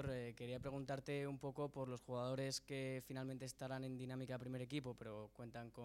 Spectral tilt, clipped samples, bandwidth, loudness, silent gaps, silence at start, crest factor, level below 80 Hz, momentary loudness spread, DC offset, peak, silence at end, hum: -5.5 dB/octave; under 0.1%; 16.5 kHz; -48 LUFS; none; 0 s; 16 dB; -70 dBFS; 7 LU; under 0.1%; -32 dBFS; 0 s; none